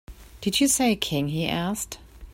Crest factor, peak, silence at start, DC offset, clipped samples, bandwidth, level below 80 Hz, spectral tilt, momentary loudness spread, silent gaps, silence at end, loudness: 18 dB; -8 dBFS; 0.1 s; under 0.1%; under 0.1%; 16.5 kHz; -48 dBFS; -3.5 dB/octave; 12 LU; none; 0 s; -24 LUFS